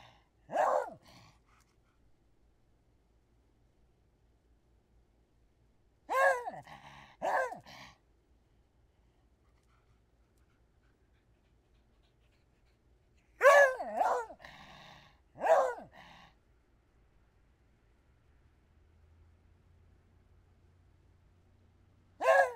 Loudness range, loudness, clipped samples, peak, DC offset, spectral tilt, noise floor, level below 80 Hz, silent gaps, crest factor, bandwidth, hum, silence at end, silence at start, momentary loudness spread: 12 LU; -30 LUFS; under 0.1%; -10 dBFS; under 0.1%; -2.5 dB/octave; -69 dBFS; -70 dBFS; none; 26 dB; 16 kHz; none; 0 s; 0.5 s; 28 LU